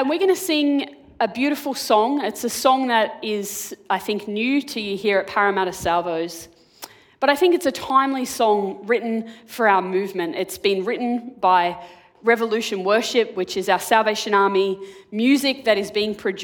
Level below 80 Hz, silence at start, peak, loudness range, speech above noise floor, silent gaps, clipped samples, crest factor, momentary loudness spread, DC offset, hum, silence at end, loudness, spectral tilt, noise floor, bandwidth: -60 dBFS; 0 s; 0 dBFS; 2 LU; 23 dB; none; under 0.1%; 20 dB; 9 LU; under 0.1%; none; 0 s; -21 LUFS; -3.5 dB/octave; -43 dBFS; 19 kHz